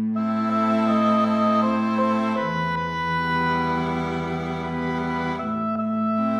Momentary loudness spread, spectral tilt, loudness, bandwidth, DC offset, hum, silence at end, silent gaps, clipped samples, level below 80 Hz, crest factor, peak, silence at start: 7 LU; -7 dB/octave; -23 LUFS; 7.4 kHz; under 0.1%; none; 0 s; none; under 0.1%; -50 dBFS; 12 dB; -10 dBFS; 0 s